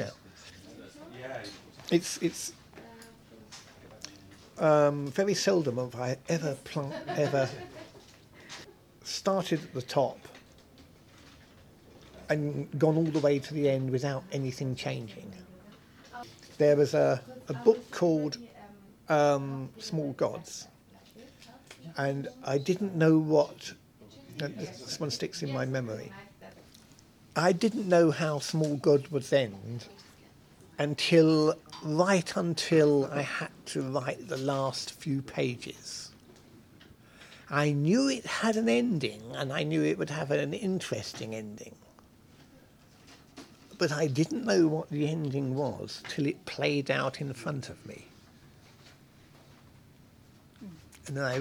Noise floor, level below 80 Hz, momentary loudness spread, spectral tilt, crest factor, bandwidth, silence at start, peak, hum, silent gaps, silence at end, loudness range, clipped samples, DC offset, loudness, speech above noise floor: -58 dBFS; -68 dBFS; 23 LU; -5.5 dB/octave; 22 dB; 19.5 kHz; 0 s; -10 dBFS; none; none; 0 s; 8 LU; under 0.1%; under 0.1%; -29 LUFS; 29 dB